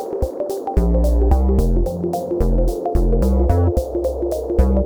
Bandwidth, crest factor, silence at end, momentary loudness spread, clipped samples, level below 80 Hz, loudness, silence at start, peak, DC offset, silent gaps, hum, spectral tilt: 18.5 kHz; 14 dB; 0 s; 6 LU; under 0.1%; -18 dBFS; -19 LUFS; 0 s; -2 dBFS; under 0.1%; none; none; -9 dB/octave